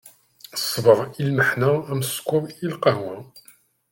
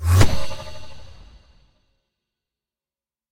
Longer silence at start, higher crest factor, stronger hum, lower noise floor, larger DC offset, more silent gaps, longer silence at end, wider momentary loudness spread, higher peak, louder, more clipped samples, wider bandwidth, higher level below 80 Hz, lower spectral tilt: about the same, 0.05 s vs 0 s; about the same, 22 dB vs 20 dB; neither; second, -55 dBFS vs under -90 dBFS; neither; neither; second, 0.55 s vs 2.2 s; second, 12 LU vs 26 LU; about the same, -2 dBFS vs 0 dBFS; about the same, -22 LUFS vs -21 LUFS; neither; about the same, 17 kHz vs 17 kHz; second, -62 dBFS vs -34 dBFS; about the same, -5 dB/octave vs -5 dB/octave